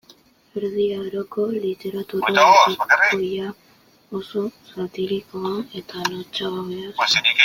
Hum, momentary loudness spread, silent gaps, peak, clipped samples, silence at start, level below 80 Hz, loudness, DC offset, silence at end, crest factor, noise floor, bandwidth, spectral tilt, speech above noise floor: none; 16 LU; none; -2 dBFS; under 0.1%; 0.55 s; -64 dBFS; -20 LUFS; under 0.1%; 0 s; 20 dB; -54 dBFS; 16.5 kHz; -3 dB/octave; 33 dB